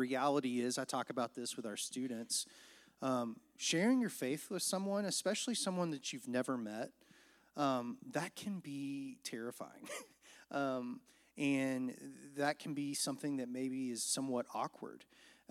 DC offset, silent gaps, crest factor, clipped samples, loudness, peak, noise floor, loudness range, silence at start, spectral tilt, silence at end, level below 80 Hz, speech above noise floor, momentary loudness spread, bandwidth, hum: under 0.1%; none; 18 dB; under 0.1%; -39 LUFS; -20 dBFS; -67 dBFS; 6 LU; 0 s; -3.5 dB/octave; 0.2 s; -88 dBFS; 28 dB; 13 LU; 16 kHz; none